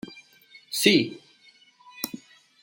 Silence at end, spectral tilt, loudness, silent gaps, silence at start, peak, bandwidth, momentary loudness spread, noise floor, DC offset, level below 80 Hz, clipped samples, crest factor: 0.45 s; -3.5 dB/octave; -24 LUFS; none; 0.1 s; -4 dBFS; 17 kHz; 24 LU; -57 dBFS; under 0.1%; -72 dBFS; under 0.1%; 24 dB